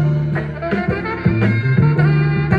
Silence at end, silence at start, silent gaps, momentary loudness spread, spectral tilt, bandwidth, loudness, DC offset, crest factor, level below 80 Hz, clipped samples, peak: 0 s; 0 s; none; 7 LU; -10 dB/octave; 5 kHz; -17 LUFS; under 0.1%; 14 dB; -38 dBFS; under 0.1%; -2 dBFS